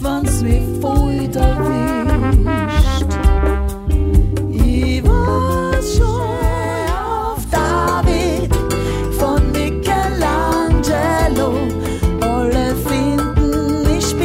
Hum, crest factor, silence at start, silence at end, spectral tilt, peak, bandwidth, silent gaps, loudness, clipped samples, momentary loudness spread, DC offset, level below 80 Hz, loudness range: none; 14 dB; 0 s; 0 s; -6 dB/octave; 0 dBFS; 16.5 kHz; none; -17 LUFS; under 0.1%; 4 LU; under 0.1%; -18 dBFS; 1 LU